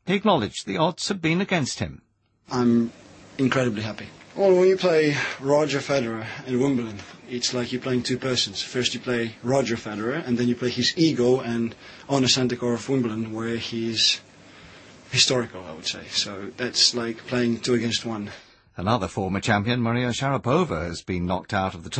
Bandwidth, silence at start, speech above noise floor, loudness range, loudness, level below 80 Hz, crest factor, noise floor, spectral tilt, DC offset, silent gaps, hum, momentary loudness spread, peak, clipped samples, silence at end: 8.8 kHz; 0.05 s; 24 dB; 3 LU; -24 LUFS; -54 dBFS; 18 dB; -47 dBFS; -4.5 dB/octave; under 0.1%; none; none; 11 LU; -6 dBFS; under 0.1%; 0 s